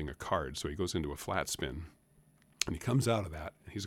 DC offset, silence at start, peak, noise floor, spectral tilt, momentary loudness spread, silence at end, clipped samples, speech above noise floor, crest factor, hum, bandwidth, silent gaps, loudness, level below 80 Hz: under 0.1%; 0 s; -6 dBFS; -66 dBFS; -4.5 dB/octave; 13 LU; 0 s; under 0.1%; 31 dB; 30 dB; none; 17 kHz; none; -35 LUFS; -52 dBFS